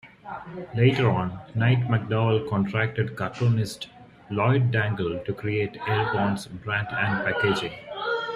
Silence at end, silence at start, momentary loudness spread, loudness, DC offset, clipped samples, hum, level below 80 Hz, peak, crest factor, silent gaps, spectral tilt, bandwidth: 0 s; 0.05 s; 11 LU; -25 LUFS; under 0.1%; under 0.1%; none; -56 dBFS; -6 dBFS; 18 dB; none; -7 dB/octave; 12 kHz